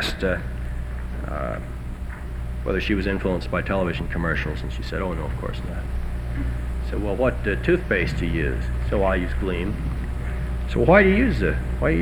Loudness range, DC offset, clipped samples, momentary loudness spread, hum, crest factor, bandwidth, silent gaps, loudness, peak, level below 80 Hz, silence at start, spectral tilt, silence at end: 6 LU; under 0.1%; under 0.1%; 11 LU; 60 Hz at -30 dBFS; 20 dB; 13 kHz; none; -24 LUFS; -2 dBFS; -28 dBFS; 0 s; -7 dB/octave; 0 s